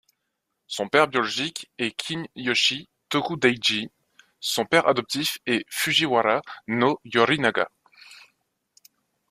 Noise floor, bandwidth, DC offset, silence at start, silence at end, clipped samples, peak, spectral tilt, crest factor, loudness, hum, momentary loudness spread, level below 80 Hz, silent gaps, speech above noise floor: -79 dBFS; 15.5 kHz; under 0.1%; 0.7 s; 1.15 s; under 0.1%; -2 dBFS; -3 dB/octave; 22 dB; -23 LUFS; none; 10 LU; -66 dBFS; none; 55 dB